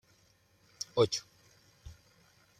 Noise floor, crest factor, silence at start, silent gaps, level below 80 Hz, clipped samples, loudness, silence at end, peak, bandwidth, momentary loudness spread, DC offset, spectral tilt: -68 dBFS; 24 dB; 0.95 s; none; -64 dBFS; under 0.1%; -33 LUFS; 0.65 s; -14 dBFS; 14 kHz; 25 LU; under 0.1%; -4 dB/octave